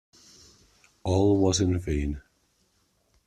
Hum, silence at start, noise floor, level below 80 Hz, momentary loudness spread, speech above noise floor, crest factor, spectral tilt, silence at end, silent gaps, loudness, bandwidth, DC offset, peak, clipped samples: none; 1.05 s; -69 dBFS; -42 dBFS; 14 LU; 45 dB; 18 dB; -6 dB/octave; 1.05 s; none; -25 LUFS; 11.5 kHz; under 0.1%; -10 dBFS; under 0.1%